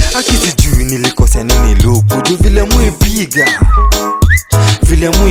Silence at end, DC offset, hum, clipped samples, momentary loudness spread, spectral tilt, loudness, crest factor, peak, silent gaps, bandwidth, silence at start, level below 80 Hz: 0 s; under 0.1%; none; 0.3%; 2 LU; -4.5 dB/octave; -10 LUFS; 8 dB; 0 dBFS; none; 17 kHz; 0 s; -12 dBFS